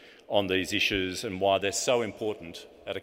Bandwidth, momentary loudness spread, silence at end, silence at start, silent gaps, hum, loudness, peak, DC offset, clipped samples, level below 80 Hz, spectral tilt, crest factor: 16 kHz; 13 LU; 0 s; 0 s; none; none; -28 LUFS; -10 dBFS; under 0.1%; under 0.1%; -58 dBFS; -3 dB/octave; 20 dB